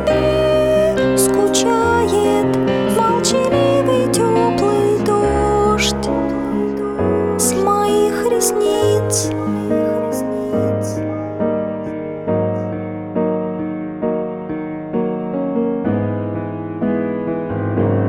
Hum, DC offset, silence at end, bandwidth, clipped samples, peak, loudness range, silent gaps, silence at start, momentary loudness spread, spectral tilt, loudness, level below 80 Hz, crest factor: none; under 0.1%; 0 s; 17.5 kHz; under 0.1%; 0 dBFS; 7 LU; none; 0 s; 8 LU; -5 dB/octave; -17 LUFS; -38 dBFS; 16 dB